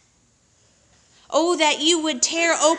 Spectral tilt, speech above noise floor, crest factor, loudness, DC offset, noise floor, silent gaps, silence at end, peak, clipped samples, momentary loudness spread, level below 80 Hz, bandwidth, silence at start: 0 dB/octave; 41 dB; 18 dB; -19 LUFS; under 0.1%; -61 dBFS; none; 0 s; -4 dBFS; under 0.1%; 4 LU; -68 dBFS; 11 kHz; 1.3 s